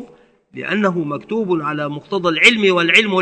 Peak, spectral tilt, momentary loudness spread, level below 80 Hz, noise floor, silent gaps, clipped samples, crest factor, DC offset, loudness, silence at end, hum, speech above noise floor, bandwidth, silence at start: 0 dBFS; -4.5 dB/octave; 12 LU; -60 dBFS; -47 dBFS; none; 0.1%; 18 dB; under 0.1%; -15 LUFS; 0 s; none; 31 dB; 11 kHz; 0 s